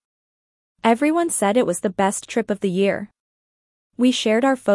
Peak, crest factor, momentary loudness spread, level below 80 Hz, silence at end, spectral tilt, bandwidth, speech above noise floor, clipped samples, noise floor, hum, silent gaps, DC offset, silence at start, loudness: -4 dBFS; 16 dB; 6 LU; -64 dBFS; 0 s; -4.5 dB/octave; 12 kHz; over 71 dB; under 0.1%; under -90 dBFS; none; 3.20-3.90 s; under 0.1%; 0.85 s; -20 LUFS